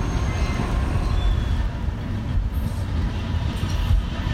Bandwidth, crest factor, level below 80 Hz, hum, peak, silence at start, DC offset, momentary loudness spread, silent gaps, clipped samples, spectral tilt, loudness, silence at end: 13.5 kHz; 14 dB; -24 dBFS; none; -8 dBFS; 0 s; under 0.1%; 3 LU; none; under 0.1%; -6.5 dB/octave; -25 LUFS; 0 s